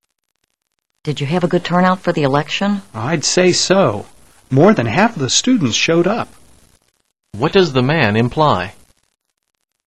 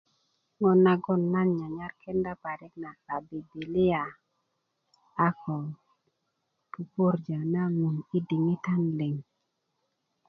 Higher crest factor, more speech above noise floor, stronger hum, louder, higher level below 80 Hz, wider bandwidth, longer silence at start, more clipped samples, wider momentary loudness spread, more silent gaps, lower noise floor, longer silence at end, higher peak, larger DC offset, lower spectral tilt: about the same, 16 dB vs 20 dB; first, 57 dB vs 51 dB; neither; first, -15 LUFS vs -28 LUFS; first, -48 dBFS vs -64 dBFS; first, 12 kHz vs 5.8 kHz; first, 1.05 s vs 0.6 s; neither; second, 10 LU vs 16 LU; neither; second, -72 dBFS vs -79 dBFS; about the same, 1.15 s vs 1.05 s; first, 0 dBFS vs -10 dBFS; first, 0.8% vs under 0.1%; second, -4.5 dB/octave vs -10 dB/octave